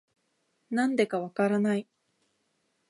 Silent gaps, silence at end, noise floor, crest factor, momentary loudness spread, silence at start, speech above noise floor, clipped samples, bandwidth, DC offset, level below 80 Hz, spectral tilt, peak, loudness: none; 1.1 s; -75 dBFS; 20 dB; 6 LU; 0.7 s; 48 dB; under 0.1%; 11.5 kHz; under 0.1%; -82 dBFS; -6.5 dB/octave; -12 dBFS; -28 LUFS